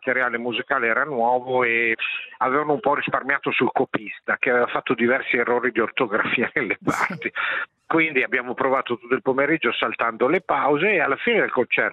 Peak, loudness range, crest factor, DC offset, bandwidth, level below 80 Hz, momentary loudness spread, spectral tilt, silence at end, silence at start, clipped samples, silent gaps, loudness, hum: -2 dBFS; 1 LU; 20 dB; under 0.1%; 13 kHz; -66 dBFS; 5 LU; -5.5 dB/octave; 0 s; 0 s; under 0.1%; none; -21 LUFS; none